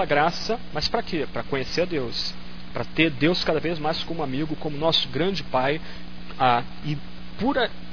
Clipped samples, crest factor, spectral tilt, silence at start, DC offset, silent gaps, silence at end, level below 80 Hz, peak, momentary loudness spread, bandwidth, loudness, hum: under 0.1%; 20 dB; -5.5 dB/octave; 0 s; 3%; none; 0 s; -44 dBFS; -4 dBFS; 11 LU; 5.4 kHz; -25 LUFS; 60 Hz at -40 dBFS